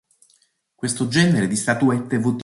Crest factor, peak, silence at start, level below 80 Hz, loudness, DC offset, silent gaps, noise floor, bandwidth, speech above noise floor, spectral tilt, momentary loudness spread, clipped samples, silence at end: 16 dB; -4 dBFS; 0.8 s; -56 dBFS; -20 LUFS; under 0.1%; none; -62 dBFS; 11.5 kHz; 43 dB; -5 dB/octave; 8 LU; under 0.1%; 0 s